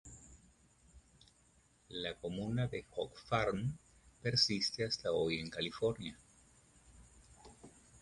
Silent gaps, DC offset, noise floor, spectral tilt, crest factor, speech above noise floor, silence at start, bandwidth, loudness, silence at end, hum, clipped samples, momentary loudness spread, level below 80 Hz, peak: none; under 0.1%; -70 dBFS; -4.5 dB/octave; 22 dB; 32 dB; 0.05 s; 11.5 kHz; -37 LUFS; 0.05 s; none; under 0.1%; 24 LU; -62 dBFS; -18 dBFS